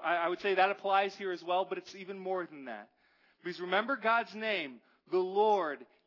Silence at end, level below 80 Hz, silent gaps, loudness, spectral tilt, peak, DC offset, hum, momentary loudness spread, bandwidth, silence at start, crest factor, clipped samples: 0.2 s; -90 dBFS; none; -32 LUFS; -5 dB/octave; -14 dBFS; under 0.1%; none; 15 LU; 6 kHz; 0 s; 20 dB; under 0.1%